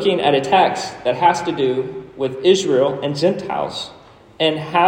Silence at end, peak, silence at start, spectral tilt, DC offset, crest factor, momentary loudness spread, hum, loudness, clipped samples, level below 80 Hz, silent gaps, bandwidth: 0 s; -2 dBFS; 0 s; -4.5 dB/octave; under 0.1%; 16 dB; 10 LU; none; -18 LUFS; under 0.1%; -58 dBFS; none; 10 kHz